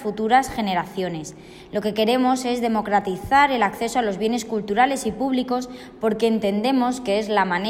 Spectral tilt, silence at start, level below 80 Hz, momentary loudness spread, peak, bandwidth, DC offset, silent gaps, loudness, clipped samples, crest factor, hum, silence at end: -4.5 dB/octave; 0 s; -52 dBFS; 8 LU; -6 dBFS; 16 kHz; under 0.1%; none; -21 LUFS; under 0.1%; 16 dB; none; 0 s